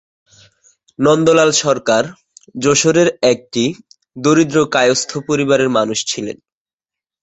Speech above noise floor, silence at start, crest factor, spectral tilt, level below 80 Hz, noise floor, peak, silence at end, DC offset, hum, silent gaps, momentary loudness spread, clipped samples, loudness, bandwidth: 75 dB; 1 s; 16 dB; -4 dB/octave; -54 dBFS; -89 dBFS; 0 dBFS; 0.85 s; under 0.1%; none; none; 11 LU; under 0.1%; -14 LUFS; 8.4 kHz